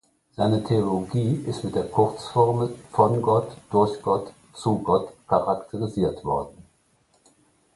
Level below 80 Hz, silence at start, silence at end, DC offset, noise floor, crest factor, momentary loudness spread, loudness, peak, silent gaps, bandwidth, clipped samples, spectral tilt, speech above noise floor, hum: -52 dBFS; 0.4 s; 1.25 s; under 0.1%; -64 dBFS; 20 dB; 7 LU; -24 LUFS; -4 dBFS; none; 11.5 kHz; under 0.1%; -8 dB/octave; 41 dB; none